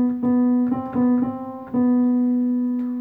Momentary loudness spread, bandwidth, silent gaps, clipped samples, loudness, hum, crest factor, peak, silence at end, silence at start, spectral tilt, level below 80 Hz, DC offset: 6 LU; 2.1 kHz; none; under 0.1%; -21 LUFS; none; 8 dB; -12 dBFS; 0 s; 0 s; -11 dB/octave; -60 dBFS; under 0.1%